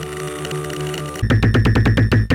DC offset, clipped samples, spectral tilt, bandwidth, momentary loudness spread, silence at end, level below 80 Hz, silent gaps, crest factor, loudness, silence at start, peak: under 0.1%; under 0.1%; -6.5 dB/octave; 16 kHz; 11 LU; 0 s; -26 dBFS; none; 12 dB; -18 LUFS; 0 s; -4 dBFS